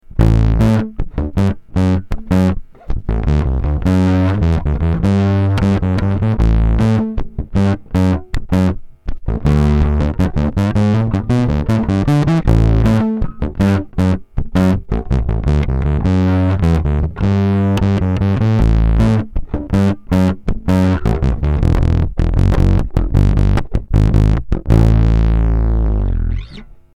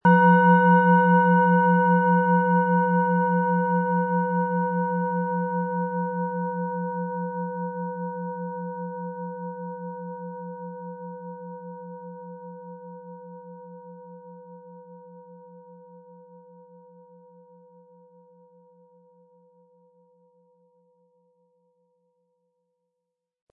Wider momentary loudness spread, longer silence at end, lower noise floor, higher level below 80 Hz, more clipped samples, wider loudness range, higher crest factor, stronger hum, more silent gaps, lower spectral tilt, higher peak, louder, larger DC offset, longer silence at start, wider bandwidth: second, 7 LU vs 25 LU; second, 0.3 s vs 7.55 s; second, -35 dBFS vs -84 dBFS; first, -18 dBFS vs -80 dBFS; neither; second, 2 LU vs 25 LU; second, 14 dB vs 20 dB; neither; neither; second, -8.5 dB/octave vs -12 dB/octave; first, 0 dBFS vs -6 dBFS; first, -15 LUFS vs -23 LUFS; neither; about the same, 0.1 s vs 0.05 s; first, 10 kHz vs 3.1 kHz